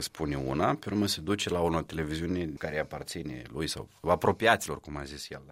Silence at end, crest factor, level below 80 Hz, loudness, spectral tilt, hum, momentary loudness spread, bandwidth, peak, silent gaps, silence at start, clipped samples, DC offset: 0 s; 24 dB; -50 dBFS; -31 LUFS; -4.5 dB/octave; none; 13 LU; 16 kHz; -6 dBFS; none; 0 s; under 0.1%; under 0.1%